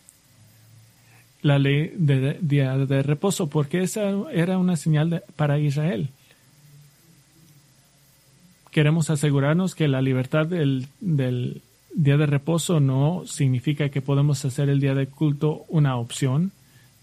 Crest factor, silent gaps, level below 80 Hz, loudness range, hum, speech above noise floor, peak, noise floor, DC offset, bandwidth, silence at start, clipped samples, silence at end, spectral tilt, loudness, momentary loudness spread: 18 dB; none; -60 dBFS; 5 LU; none; 35 dB; -4 dBFS; -57 dBFS; under 0.1%; 13.5 kHz; 1.45 s; under 0.1%; 0.5 s; -6.5 dB/octave; -23 LUFS; 5 LU